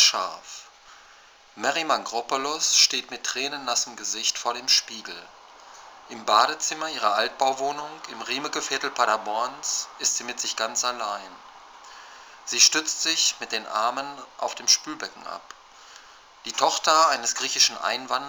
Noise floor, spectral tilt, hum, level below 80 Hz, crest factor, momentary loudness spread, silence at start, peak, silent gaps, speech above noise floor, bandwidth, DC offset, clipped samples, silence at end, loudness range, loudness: -52 dBFS; 1 dB/octave; none; -72 dBFS; 24 dB; 18 LU; 0 s; -2 dBFS; none; 27 dB; over 20 kHz; under 0.1%; under 0.1%; 0 s; 4 LU; -23 LUFS